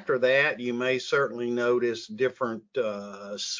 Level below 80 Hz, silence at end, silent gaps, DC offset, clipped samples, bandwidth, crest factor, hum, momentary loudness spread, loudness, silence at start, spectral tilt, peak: -76 dBFS; 0 s; none; under 0.1%; under 0.1%; 7.6 kHz; 18 dB; none; 10 LU; -27 LUFS; 0 s; -4 dB/octave; -10 dBFS